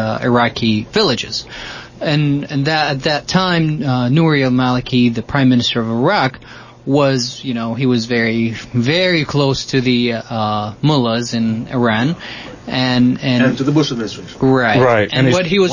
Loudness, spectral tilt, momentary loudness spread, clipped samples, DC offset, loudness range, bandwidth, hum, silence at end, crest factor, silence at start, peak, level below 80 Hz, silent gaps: -15 LUFS; -6 dB/octave; 8 LU; under 0.1%; under 0.1%; 2 LU; 7.4 kHz; none; 0 s; 14 dB; 0 s; -2 dBFS; -44 dBFS; none